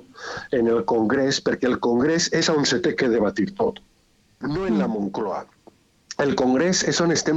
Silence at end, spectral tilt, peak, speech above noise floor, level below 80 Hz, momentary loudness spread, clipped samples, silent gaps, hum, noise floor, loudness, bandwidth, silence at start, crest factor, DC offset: 0 s; -4 dB/octave; -8 dBFS; 39 dB; -54 dBFS; 9 LU; under 0.1%; none; none; -60 dBFS; -22 LUFS; 8.2 kHz; 0.15 s; 14 dB; under 0.1%